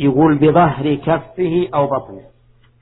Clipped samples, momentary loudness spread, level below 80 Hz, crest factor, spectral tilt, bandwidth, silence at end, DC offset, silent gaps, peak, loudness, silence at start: under 0.1%; 8 LU; -44 dBFS; 16 dB; -12 dB/octave; 4.1 kHz; 0.6 s; under 0.1%; none; 0 dBFS; -15 LUFS; 0 s